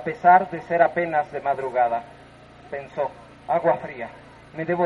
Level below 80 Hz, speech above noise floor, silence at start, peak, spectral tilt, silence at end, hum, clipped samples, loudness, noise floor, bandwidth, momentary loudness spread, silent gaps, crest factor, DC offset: -60 dBFS; 25 dB; 0 s; -2 dBFS; -7.5 dB/octave; 0 s; none; under 0.1%; -22 LUFS; -47 dBFS; 6 kHz; 19 LU; none; 20 dB; under 0.1%